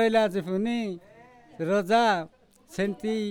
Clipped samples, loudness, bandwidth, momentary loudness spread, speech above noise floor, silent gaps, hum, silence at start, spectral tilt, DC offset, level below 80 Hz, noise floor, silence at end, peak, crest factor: under 0.1%; -26 LUFS; 17.5 kHz; 15 LU; 27 dB; none; none; 0 s; -5.5 dB/octave; under 0.1%; -64 dBFS; -52 dBFS; 0 s; -10 dBFS; 16 dB